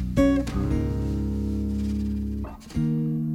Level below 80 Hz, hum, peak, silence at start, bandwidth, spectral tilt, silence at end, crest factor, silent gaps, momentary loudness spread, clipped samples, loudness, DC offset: -32 dBFS; none; -8 dBFS; 0 s; 13.5 kHz; -8 dB/octave; 0 s; 18 dB; none; 8 LU; under 0.1%; -26 LUFS; under 0.1%